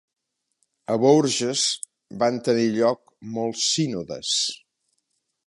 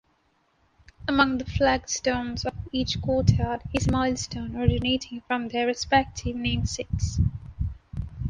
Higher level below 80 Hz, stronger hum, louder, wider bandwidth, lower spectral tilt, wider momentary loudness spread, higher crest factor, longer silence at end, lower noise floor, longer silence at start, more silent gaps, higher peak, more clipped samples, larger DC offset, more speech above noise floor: second, -68 dBFS vs -36 dBFS; neither; first, -22 LUFS vs -26 LUFS; about the same, 11.5 kHz vs 10.5 kHz; second, -3.5 dB/octave vs -5 dB/octave; first, 15 LU vs 10 LU; about the same, 20 dB vs 20 dB; first, 0.9 s vs 0 s; first, -75 dBFS vs -67 dBFS; about the same, 0.9 s vs 1 s; neither; about the same, -4 dBFS vs -6 dBFS; neither; neither; first, 53 dB vs 42 dB